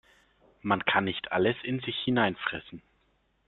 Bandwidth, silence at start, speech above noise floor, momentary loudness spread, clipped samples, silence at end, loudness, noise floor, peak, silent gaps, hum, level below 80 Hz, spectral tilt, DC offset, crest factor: 4.3 kHz; 0.65 s; 42 dB; 12 LU; under 0.1%; 0.7 s; -28 LUFS; -70 dBFS; -8 dBFS; none; none; -64 dBFS; -8.5 dB/octave; under 0.1%; 22 dB